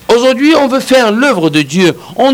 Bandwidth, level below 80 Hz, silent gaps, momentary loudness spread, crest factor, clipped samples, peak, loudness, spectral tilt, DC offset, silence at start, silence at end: 16.5 kHz; -50 dBFS; none; 4 LU; 8 dB; under 0.1%; 0 dBFS; -9 LUFS; -4.5 dB/octave; under 0.1%; 0.1 s; 0 s